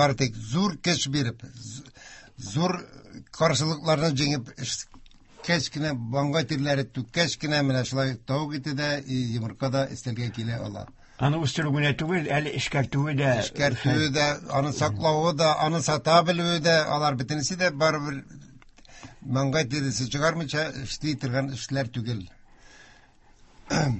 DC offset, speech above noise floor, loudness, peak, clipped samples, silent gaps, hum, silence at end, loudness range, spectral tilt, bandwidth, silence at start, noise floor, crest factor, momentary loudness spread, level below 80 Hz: under 0.1%; 29 dB; -26 LUFS; -6 dBFS; under 0.1%; none; none; 0 s; 6 LU; -5 dB/octave; 8.6 kHz; 0 s; -55 dBFS; 22 dB; 11 LU; -54 dBFS